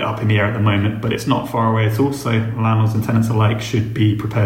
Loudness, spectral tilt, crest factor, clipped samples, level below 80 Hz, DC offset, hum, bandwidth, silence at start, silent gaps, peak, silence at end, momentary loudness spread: -18 LUFS; -7 dB/octave; 14 dB; under 0.1%; -46 dBFS; under 0.1%; none; 15.5 kHz; 0 s; none; -2 dBFS; 0 s; 3 LU